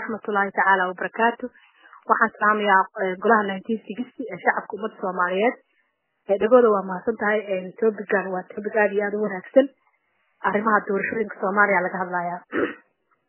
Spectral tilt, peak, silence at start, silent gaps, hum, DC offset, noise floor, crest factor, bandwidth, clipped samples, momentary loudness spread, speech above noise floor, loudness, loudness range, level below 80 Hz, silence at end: -9 dB/octave; -2 dBFS; 0 s; none; none; under 0.1%; -70 dBFS; 20 dB; 3.2 kHz; under 0.1%; 11 LU; 48 dB; -22 LUFS; 2 LU; -70 dBFS; 0.55 s